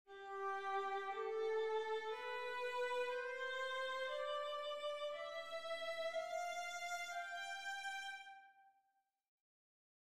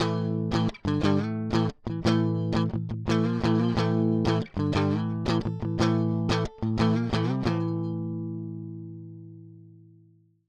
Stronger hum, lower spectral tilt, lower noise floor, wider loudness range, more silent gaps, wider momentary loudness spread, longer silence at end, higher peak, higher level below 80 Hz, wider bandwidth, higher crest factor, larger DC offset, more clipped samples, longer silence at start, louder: neither; second, -0.5 dB/octave vs -7.5 dB/octave; first, -84 dBFS vs -59 dBFS; about the same, 5 LU vs 4 LU; first, 9.28-9.38 s vs none; second, 6 LU vs 11 LU; second, 0.6 s vs 0.8 s; second, -30 dBFS vs -10 dBFS; second, -86 dBFS vs -48 dBFS; first, 15 kHz vs 9.2 kHz; about the same, 14 dB vs 16 dB; neither; neither; about the same, 0.05 s vs 0 s; second, -44 LUFS vs -27 LUFS